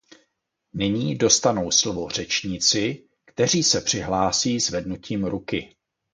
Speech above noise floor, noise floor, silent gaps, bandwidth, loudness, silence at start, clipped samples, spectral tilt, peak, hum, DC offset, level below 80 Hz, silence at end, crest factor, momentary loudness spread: 52 dB; -75 dBFS; none; 11 kHz; -22 LUFS; 0.75 s; under 0.1%; -3 dB/octave; -2 dBFS; none; under 0.1%; -50 dBFS; 0.5 s; 22 dB; 11 LU